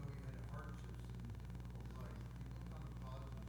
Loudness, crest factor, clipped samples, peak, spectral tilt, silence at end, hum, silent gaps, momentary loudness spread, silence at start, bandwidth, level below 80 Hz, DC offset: -51 LUFS; 12 dB; under 0.1%; -38 dBFS; -7 dB/octave; 0 s; 60 Hz at -50 dBFS; none; 1 LU; 0 s; over 20 kHz; -54 dBFS; under 0.1%